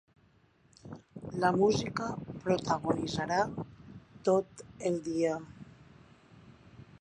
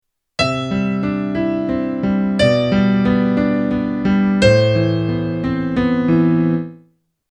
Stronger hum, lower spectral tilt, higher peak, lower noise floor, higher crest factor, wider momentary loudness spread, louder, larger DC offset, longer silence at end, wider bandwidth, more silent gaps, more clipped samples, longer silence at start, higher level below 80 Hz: neither; second, -5.5 dB/octave vs -7 dB/octave; second, -14 dBFS vs 0 dBFS; first, -66 dBFS vs -55 dBFS; about the same, 20 dB vs 16 dB; first, 22 LU vs 7 LU; second, -32 LUFS vs -17 LUFS; neither; second, 0.2 s vs 0.65 s; first, 11 kHz vs 9.8 kHz; neither; neither; first, 0.85 s vs 0.4 s; second, -62 dBFS vs -40 dBFS